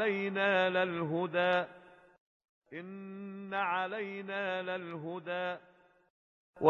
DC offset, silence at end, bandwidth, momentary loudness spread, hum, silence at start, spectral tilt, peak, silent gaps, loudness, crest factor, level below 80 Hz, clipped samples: under 0.1%; 0 s; 7 kHz; 16 LU; none; 0 s; -7 dB/octave; -10 dBFS; 2.20-2.40 s, 2.49-2.62 s, 6.10-6.53 s; -34 LUFS; 24 dB; -80 dBFS; under 0.1%